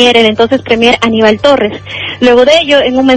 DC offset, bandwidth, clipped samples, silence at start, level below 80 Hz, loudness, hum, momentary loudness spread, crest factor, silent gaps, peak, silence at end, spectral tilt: under 0.1%; 11 kHz; 1%; 0 s; -38 dBFS; -7 LUFS; none; 7 LU; 8 dB; none; 0 dBFS; 0 s; -4 dB/octave